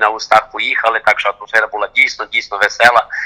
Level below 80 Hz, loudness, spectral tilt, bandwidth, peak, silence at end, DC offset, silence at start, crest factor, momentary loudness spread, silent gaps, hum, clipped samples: -52 dBFS; -13 LUFS; -1 dB/octave; over 20 kHz; 0 dBFS; 0 s; under 0.1%; 0 s; 14 dB; 6 LU; none; none; 0.8%